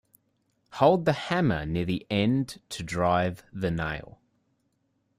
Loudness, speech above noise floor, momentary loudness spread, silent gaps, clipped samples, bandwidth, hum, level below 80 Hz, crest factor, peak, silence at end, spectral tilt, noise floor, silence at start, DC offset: -27 LUFS; 47 dB; 12 LU; none; under 0.1%; 15 kHz; none; -52 dBFS; 20 dB; -8 dBFS; 1.1 s; -6.5 dB/octave; -73 dBFS; 0.7 s; under 0.1%